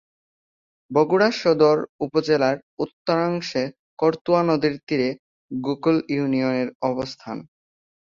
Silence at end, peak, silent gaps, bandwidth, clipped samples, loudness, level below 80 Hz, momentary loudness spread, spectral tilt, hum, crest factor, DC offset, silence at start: 0.75 s; -4 dBFS; 1.89-1.99 s, 2.63-2.77 s, 2.93-3.05 s, 3.79-3.97 s, 4.21-4.25 s, 4.83-4.87 s, 5.19-5.49 s, 6.75-6.80 s; 7.4 kHz; under 0.1%; -22 LUFS; -64 dBFS; 13 LU; -6.5 dB/octave; none; 18 dB; under 0.1%; 0.9 s